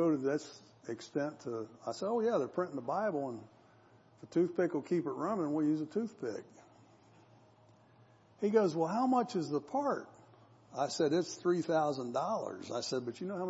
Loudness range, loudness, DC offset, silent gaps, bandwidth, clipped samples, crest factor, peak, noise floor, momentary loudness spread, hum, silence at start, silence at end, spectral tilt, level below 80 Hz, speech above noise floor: 4 LU; -35 LUFS; under 0.1%; none; 8 kHz; under 0.1%; 20 dB; -16 dBFS; -63 dBFS; 11 LU; none; 0 s; 0 s; -6 dB/octave; -84 dBFS; 29 dB